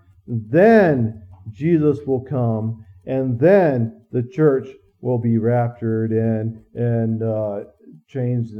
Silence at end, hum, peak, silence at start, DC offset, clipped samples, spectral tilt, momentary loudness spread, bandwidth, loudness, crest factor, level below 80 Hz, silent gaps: 0 s; none; 0 dBFS; 0.3 s; under 0.1%; under 0.1%; -10.5 dB/octave; 15 LU; 5.8 kHz; -19 LUFS; 18 dB; -60 dBFS; none